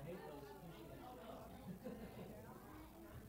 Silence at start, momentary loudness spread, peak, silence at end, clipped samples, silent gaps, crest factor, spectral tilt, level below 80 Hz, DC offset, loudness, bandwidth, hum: 0 s; 5 LU; -40 dBFS; 0 s; under 0.1%; none; 14 dB; -6.5 dB/octave; -66 dBFS; under 0.1%; -55 LUFS; 16 kHz; none